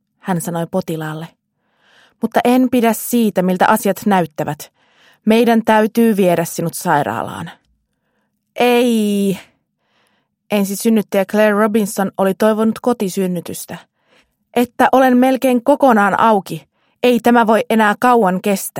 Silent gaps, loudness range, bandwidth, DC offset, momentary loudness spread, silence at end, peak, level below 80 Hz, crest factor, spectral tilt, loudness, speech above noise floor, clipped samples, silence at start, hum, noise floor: none; 5 LU; 16.5 kHz; under 0.1%; 12 LU; 0 s; 0 dBFS; -60 dBFS; 16 dB; -5.5 dB/octave; -15 LUFS; 53 dB; under 0.1%; 0.25 s; none; -67 dBFS